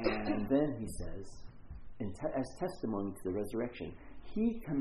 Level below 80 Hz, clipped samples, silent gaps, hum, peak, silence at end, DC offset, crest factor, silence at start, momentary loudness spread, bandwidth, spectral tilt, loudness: -50 dBFS; under 0.1%; none; none; -16 dBFS; 0 s; under 0.1%; 20 dB; 0 s; 21 LU; 12 kHz; -7 dB/octave; -37 LUFS